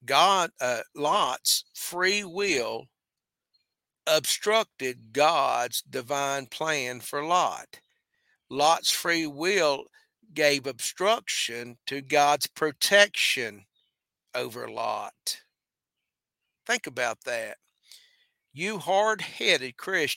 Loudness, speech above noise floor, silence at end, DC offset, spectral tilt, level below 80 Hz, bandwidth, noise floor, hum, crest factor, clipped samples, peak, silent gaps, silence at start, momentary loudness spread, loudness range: -26 LUFS; 63 dB; 0 s; under 0.1%; -1.5 dB/octave; -76 dBFS; 17 kHz; -89 dBFS; none; 26 dB; under 0.1%; -2 dBFS; none; 0.05 s; 12 LU; 9 LU